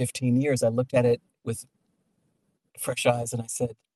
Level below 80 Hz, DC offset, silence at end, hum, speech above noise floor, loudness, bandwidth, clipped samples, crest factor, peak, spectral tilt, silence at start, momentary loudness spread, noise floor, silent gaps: -66 dBFS; under 0.1%; 0.25 s; none; 47 dB; -26 LUFS; 13.5 kHz; under 0.1%; 20 dB; -8 dBFS; -5.5 dB/octave; 0 s; 12 LU; -73 dBFS; none